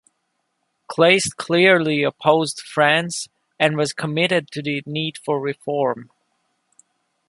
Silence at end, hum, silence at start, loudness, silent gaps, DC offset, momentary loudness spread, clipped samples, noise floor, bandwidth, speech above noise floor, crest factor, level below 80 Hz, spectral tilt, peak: 1.25 s; none; 0.9 s; -19 LUFS; none; under 0.1%; 11 LU; under 0.1%; -73 dBFS; 11.5 kHz; 53 dB; 20 dB; -66 dBFS; -4 dB/octave; -2 dBFS